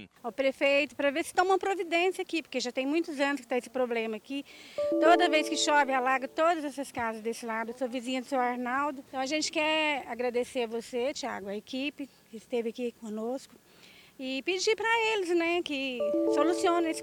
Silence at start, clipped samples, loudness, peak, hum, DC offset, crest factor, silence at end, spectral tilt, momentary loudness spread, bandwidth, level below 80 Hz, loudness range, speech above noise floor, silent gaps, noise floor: 0 s; under 0.1%; -29 LUFS; -10 dBFS; none; under 0.1%; 20 dB; 0 s; -2.5 dB/octave; 11 LU; 17.5 kHz; -72 dBFS; 7 LU; 26 dB; none; -56 dBFS